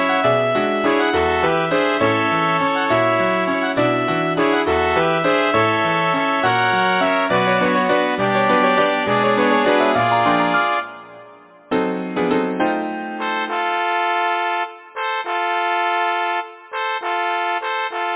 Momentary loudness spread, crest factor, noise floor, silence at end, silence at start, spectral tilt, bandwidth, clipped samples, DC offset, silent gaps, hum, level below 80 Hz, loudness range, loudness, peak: 7 LU; 16 dB; -44 dBFS; 0 s; 0 s; -9 dB/octave; 4 kHz; under 0.1%; under 0.1%; none; none; -48 dBFS; 5 LU; -18 LUFS; -2 dBFS